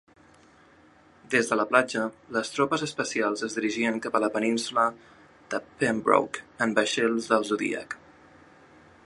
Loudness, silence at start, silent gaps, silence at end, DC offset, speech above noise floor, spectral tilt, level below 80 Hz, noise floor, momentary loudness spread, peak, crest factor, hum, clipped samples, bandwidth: -26 LUFS; 1.3 s; none; 1.1 s; under 0.1%; 30 dB; -3.5 dB/octave; -68 dBFS; -57 dBFS; 9 LU; -4 dBFS; 24 dB; none; under 0.1%; 11.5 kHz